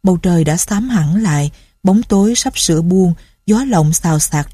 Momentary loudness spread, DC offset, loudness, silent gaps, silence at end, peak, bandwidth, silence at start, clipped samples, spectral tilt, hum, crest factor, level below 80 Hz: 4 LU; under 0.1%; -14 LUFS; none; 0 s; 0 dBFS; 15.5 kHz; 0.05 s; under 0.1%; -5 dB/octave; none; 12 dB; -36 dBFS